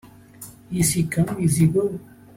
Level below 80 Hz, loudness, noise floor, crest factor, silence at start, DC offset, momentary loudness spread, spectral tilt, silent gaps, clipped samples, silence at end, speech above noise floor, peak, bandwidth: -48 dBFS; -21 LUFS; -44 dBFS; 16 dB; 0.05 s; under 0.1%; 22 LU; -5.5 dB/octave; none; under 0.1%; 0.35 s; 23 dB; -8 dBFS; 16.5 kHz